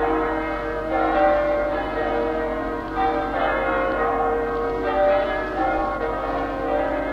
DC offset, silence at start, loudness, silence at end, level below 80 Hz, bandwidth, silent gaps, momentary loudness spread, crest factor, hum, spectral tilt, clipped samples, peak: under 0.1%; 0 s; -22 LUFS; 0 s; -38 dBFS; 8.6 kHz; none; 6 LU; 16 dB; 50 Hz at -40 dBFS; -7 dB/octave; under 0.1%; -6 dBFS